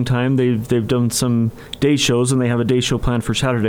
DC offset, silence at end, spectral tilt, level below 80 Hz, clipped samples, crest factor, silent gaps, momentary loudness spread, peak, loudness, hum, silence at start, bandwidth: under 0.1%; 0 s; -5.5 dB/octave; -36 dBFS; under 0.1%; 14 dB; none; 4 LU; -4 dBFS; -18 LUFS; none; 0 s; 16.5 kHz